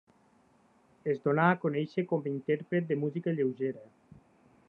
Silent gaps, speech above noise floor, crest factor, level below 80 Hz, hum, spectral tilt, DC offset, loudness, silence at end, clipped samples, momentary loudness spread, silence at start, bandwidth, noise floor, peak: none; 35 dB; 22 dB; -80 dBFS; none; -9.5 dB/octave; under 0.1%; -31 LUFS; 0.85 s; under 0.1%; 10 LU; 1.05 s; 5.6 kHz; -65 dBFS; -10 dBFS